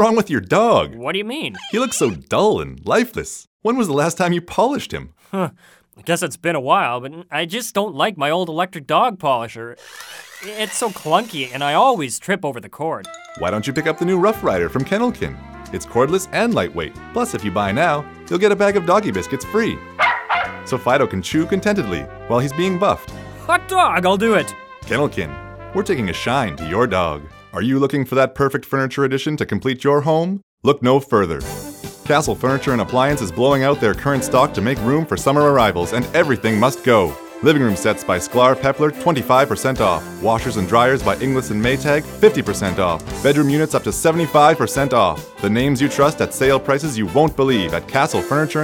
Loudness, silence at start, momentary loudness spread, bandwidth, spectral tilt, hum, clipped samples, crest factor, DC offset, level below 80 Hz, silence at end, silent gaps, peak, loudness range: -18 LUFS; 0 s; 10 LU; 18.5 kHz; -5 dB/octave; none; under 0.1%; 18 dB; under 0.1%; -44 dBFS; 0 s; 3.47-3.60 s, 30.43-30.58 s; 0 dBFS; 4 LU